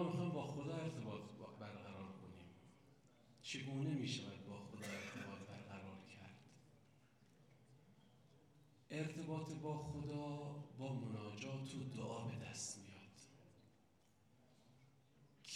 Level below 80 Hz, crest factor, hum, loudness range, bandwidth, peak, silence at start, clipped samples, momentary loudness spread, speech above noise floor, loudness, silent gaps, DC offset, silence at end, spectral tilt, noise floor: -80 dBFS; 20 dB; none; 8 LU; 14.5 kHz; -30 dBFS; 0 s; under 0.1%; 20 LU; 27 dB; -49 LUFS; none; under 0.1%; 0 s; -5.5 dB/octave; -75 dBFS